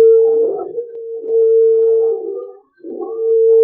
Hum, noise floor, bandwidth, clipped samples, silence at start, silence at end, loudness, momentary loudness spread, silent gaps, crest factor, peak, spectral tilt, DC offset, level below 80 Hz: none; -33 dBFS; 1.4 kHz; under 0.1%; 0 s; 0 s; -14 LUFS; 16 LU; none; 10 dB; -4 dBFS; -11 dB/octave; under 0.1%; -72 dBFS